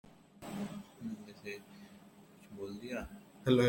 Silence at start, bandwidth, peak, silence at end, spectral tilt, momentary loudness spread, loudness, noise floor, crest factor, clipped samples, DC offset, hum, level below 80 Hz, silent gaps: 0.05 s; 16.5 kHz; -16 dBFS; 0 s; -6.5 dB/octave; 17 LU; -43 LUFS; -59 dBFS; 24 dB; under 0.1%; under 0.1%; none; -64 dBFS; none